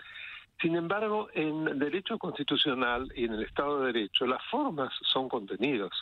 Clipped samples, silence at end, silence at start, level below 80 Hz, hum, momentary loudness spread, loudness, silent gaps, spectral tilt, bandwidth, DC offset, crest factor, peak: under 0.1%; 0 s; 0 s; -58 dBFS; none; 6 LU; -31 LUFS; none; -6.5 dB/octave; 9.2 kHz; under 0.1%; 18 dB; -14 dBFS